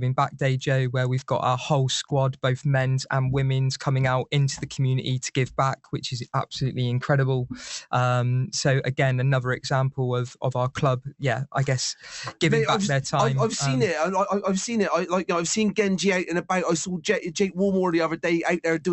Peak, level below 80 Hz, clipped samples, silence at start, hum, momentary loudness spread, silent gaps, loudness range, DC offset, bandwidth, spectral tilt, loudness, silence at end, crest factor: -8 dBFS; -56 dBFS; under 0.1%; 0 s; none; 5 LU; none; 2 LU; under 0.1%; 8.2 kHz; -5.5 dB/octave; -24 LUFS; 0 s; 16 dB